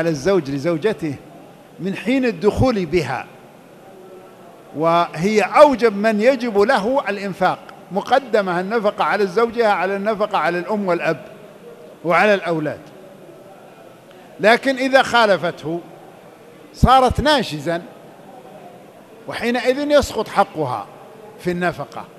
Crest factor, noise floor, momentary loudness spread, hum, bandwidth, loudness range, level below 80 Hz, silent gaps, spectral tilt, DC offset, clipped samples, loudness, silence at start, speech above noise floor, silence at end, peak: 20 dB; -43 dBFS; 14 LU; none; 14 kHz; 5 LU; -40 dBFS; none; -5.5 dB/octave; under 0.1%; under 0.1%; -18 LUFS; 0 s; 26 dB; 0.1 s; 0 dBFS